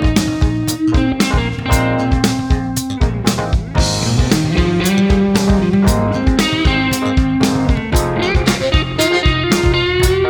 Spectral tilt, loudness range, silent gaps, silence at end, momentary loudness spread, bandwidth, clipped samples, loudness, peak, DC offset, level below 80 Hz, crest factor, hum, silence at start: -5 dB/octave; 2 LU; none; 0 s; 4 LU; over 20 kHz; under 0.1%; -15 LUFS; 0 dBFS; under 0.1%; -20 dBFS; 14 dB; none; 0 s